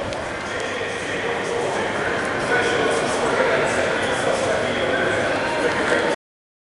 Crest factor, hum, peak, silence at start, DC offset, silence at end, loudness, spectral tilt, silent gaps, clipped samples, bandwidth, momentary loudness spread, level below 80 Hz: 16 dB; none; -6 dBFS; 0 s; under 0.1%; 0.5 s; -21 LUFS; -3.5 dB/octave; none; under 0.1%; 11.5 kHz; 6 LU; -48 dBFS